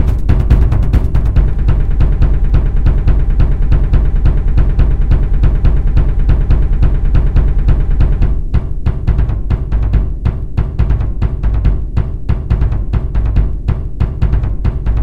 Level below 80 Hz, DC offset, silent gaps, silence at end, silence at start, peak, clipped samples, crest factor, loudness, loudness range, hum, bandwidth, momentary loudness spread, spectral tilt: -12 dBFS; 8%; none; 0 s; 0 s; 0 dBFS; 0.4%; 12 dB; -15 LUFS; 3 LU; none; 4.6 kHz; 5 LU; -9.5 dB/octave